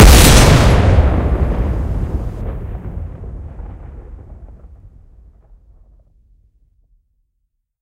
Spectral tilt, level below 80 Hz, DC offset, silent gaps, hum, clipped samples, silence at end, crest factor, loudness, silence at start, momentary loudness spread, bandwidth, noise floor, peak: -4.5 dB/octave; -18 dBFS; under 0.1%; none; none; 0.6%; 3.35 s; 14 dB; -13 LUFS; 0 s; 26 LU; 16.5 kHz; -70 dBFS; 0 dBFS